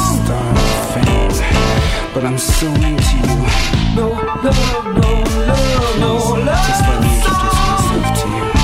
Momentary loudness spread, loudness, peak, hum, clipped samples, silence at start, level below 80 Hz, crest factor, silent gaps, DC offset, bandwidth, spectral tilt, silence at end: 3 LU; -15 LUFS; 0 dBFS; none; under 0.1%; 0 s; -18 dBFS; 12 dB; none; under 0.1%; 16 kHz; -5 dB/octave; 0 s